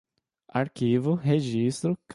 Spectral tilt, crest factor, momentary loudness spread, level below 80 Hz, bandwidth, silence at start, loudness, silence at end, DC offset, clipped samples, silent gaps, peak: -7 dB/octave; 16 dB; 6 LU; -64 dBFS; 11.5 kHz; 0.55 s; -26 LUFS; 0 s; under 0.1%; under 0.1%; none; -10 dBFS